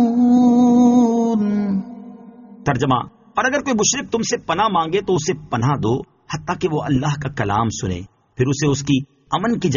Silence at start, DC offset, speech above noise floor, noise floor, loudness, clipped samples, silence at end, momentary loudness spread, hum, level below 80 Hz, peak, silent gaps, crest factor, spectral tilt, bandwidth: 0 s; under 0.1%; 21 dB; -40 dBFS; -18 LUFS; under 0.1%; 0 s; 12 LU; none; -48 dBFS; -4 dBFS; none; 14 dB; -5.5 dB/octave; 7.4 kHz